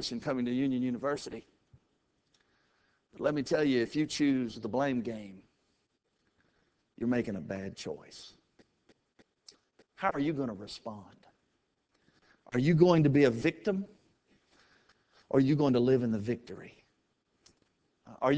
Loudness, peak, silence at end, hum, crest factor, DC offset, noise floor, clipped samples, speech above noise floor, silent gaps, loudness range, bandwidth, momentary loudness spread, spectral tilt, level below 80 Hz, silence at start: -30 LUFS; -10 dBFS; 0 s; none; 22 dB; under 0.1%; -78 dBFS; under 0.1%; 48 dB; none; 10 LU; 8 kHz; 19 LU; -7 dB/octave; -66 dBFS; 0 s